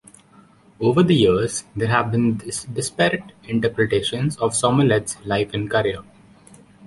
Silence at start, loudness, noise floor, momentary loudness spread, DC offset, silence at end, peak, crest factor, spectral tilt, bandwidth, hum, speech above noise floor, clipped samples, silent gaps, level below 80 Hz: 0.8 s; -20 LUFS; -51 dBFS; 10 LU; under 0.1%; 0 s; -2 dBFS; 18 dB; -5 dB/octave; 11.5 kHz; none; 31 dB; under 0.1%; none; -48 dBFS